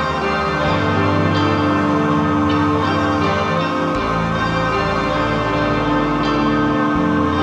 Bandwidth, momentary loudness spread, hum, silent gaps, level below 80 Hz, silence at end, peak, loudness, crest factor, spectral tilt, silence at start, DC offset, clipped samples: 8.8 kHz; 2 LU; none; none; -36 dBFS; 0 s; -4 dBFS; -17 LUFS; 12 dB; -6.5 dB/octave; 0 s; under 0.1%; under 0.1%